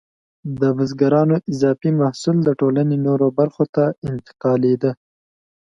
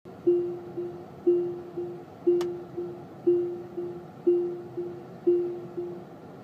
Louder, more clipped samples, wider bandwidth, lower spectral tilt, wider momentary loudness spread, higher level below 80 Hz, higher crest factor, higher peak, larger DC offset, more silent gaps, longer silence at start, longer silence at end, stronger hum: first, -18 LUFS vs -30 LUFS; neither; first, 9 kHz vs 7 kHz; about the same, -8.5 dB/octave vs -8.5 dB/octave; second, 8 LU vs 12 LU; first, -58 dBFS vs -70 dBFS; about the same, 16 dB vs 16 dB; first, -2 dBFS vs -14 dBFS; neither; first, 3.69-3.73 s, 3.98-4.02 s vs none; first, 0.45 s vs 0.05 s; first, 0.65 s vs 0 s; neither